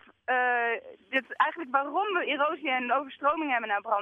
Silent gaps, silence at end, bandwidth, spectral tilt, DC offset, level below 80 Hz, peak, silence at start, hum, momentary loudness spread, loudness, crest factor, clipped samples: none; 0 s; 5.4 kHz; -4.5 dB/octave; under 0.1%; -74 dBFS; -10 dBFS; 0.3 s; none; 5 LU; -28 LUFS; 18 dB; under 0.1%